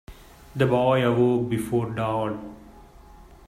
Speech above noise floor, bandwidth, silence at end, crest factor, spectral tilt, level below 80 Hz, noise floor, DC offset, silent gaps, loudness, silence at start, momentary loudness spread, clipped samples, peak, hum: 25 dB; 15.5 kHz; 0.25 s; 18 dB; -7.5 dB/octave; -50 dBFS; -48 dBFS; under 0.1%; none; -23 LUFS; 0.1 s; 15 LU; under 0.1%; -8 dBFS; none